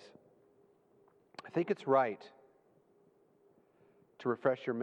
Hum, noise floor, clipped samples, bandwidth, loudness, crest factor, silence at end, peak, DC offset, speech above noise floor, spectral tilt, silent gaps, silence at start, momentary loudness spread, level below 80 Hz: none; -69 dBFS; under 0.1%; 8.8 kHz; -34 LUFS; 22 dB; 0 s; -16 dBFS; under 0.1%; 36 dB; -7.5 dB/octave; none; 1.45 s; 23 LU; -90 dBFS